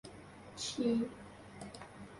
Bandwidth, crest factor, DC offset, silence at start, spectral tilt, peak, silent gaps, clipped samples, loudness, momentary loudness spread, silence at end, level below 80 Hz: 11.5 kHz; 18 dB; under 0.1%; 0.05 s; -4.5 dB/octave; -22 dBFS; none; under 0.1%; -38 LUFS; 19 LU; 0 s; -66 dBFS